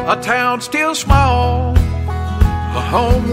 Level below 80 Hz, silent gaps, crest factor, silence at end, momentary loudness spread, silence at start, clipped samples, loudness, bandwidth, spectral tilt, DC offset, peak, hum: -20 dBFS; none; 14 dB; 0 s; 7 LU; 0 s; under 0.1%; -15 LUFS; 15.5 kHz; -5.5 dB/octave; under 0.1%; 0 dBFS; none